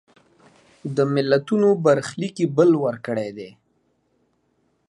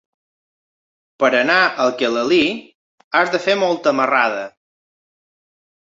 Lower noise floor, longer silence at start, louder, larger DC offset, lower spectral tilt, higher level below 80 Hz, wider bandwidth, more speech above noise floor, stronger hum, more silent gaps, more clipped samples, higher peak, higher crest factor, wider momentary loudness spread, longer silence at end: second, -67 dBFS vs under -90 dBFS; second, 0.85 s vs 1.2 s; second, -20 LUFS vs -16 LUFS; neither; first, -7 dB/octave vs -4 dB/octave; about the same, -68 dBFS vs -66 dBFS; first, 11 kHz vs 7.8 kHz; second, 47 dB vs over 74 dB; neither; second, none vs 2.75-2.98 s, 3.04-3.11 s; neither; about the same, -4 dBFS vs -2 dBFS; about the same, 18 dB vs 18 dB; first, 15 LU vs 7 LU; about the same, 1.4 s vs 1.45 s